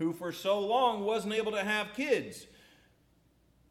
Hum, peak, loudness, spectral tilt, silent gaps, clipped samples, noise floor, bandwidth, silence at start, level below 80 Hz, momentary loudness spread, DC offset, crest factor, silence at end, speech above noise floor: none; -16 dBFS; -31 LUFS; -4 dB/octave; none; under 0.1%; -67 dBFS; 15.5 kHz; 0 s; -70 dBFS; 7 LU; under 0.1%; 18 dB; 1.25 s; 36 dB